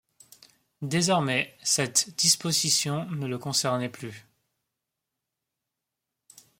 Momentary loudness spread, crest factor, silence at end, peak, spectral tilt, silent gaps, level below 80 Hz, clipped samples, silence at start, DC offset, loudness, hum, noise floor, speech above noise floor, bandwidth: 12 LU; 22 dB; 2.4 s; -8 dBFS; -2.5 dB/octave; none; -70 dBFS; under 0.1%; 0.8 s; under 0.1%; -25 LUFS; none; -86 dBFS; 59 dB; 16.5 kHz